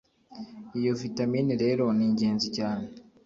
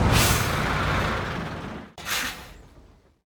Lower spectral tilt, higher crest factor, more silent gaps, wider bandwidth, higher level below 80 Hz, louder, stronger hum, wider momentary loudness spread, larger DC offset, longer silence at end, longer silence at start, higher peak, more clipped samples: first, -6.5 dB/octave vs -4 dB/octave; second, 14 dB vs 20 dB; neither; second, 7.6 kHz vs over 20 kHz; second, -64 dBFS vs -36 dBFS; about the same, -27 LUFS vs -25 LUFS; neither; about the same, 18 LU vs 17 LU; neither; second, 0.25 s vs 0.45 s; first, 0.3 s vs 0 s; second, -14 dBFS vs -6 dBFS; neither